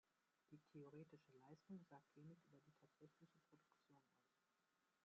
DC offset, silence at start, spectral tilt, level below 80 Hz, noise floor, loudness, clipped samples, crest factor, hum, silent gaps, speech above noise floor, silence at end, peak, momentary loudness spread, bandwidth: under 0.1%; 0.05 s; -7.5 dB/octave; under -90 dBFS; -88 dBFS; -65 LUFS; under 0.1%; 18 dB; none; none; 20 dB; 0 s; -50 dBFS; 6 LU; 7 kHz